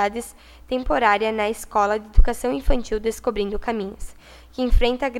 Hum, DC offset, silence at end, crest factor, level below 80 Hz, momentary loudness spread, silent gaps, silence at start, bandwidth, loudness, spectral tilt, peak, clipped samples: none; under 0.1%; 0 s; 20 dB; -24 dBFS; 14 LU; none; 0 s; 13.5 kHz; -23 LUFS; -5 dB/octave; 0 dBFS; under 0.1%